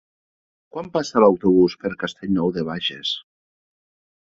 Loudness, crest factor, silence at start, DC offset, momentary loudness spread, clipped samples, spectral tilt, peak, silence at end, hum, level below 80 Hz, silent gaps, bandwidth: -21 LUFS; 20 dB; 0.75 s; under 0.1%; 13 LU; under 0.1%; -6 dB/octave; -2 dBFS; 1.05 s; none; -54 dBFS; none; 7.6 kHz